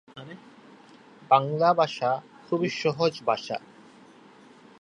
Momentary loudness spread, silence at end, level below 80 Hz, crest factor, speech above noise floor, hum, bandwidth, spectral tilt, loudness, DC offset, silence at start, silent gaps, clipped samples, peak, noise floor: 22 LU; 1.2 s; -76 dBFS; 24 dB; 28 dB; none; 10.5 kHz; -5.5 dB/octave; -26 LUFS; under 0.1%; 0.15 s; none; under 0.1%; -4 dBFS; -52 dBFS